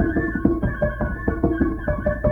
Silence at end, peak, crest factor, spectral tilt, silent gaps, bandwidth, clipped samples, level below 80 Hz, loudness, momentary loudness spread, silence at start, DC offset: 0 s; -4 dBFS; 18 dB; -10.5 dB/octave; none; 3.5 kHz; under 0.1%; -30 dBFS; -23 LUFS; 3 LU; 0 s; under 0.1%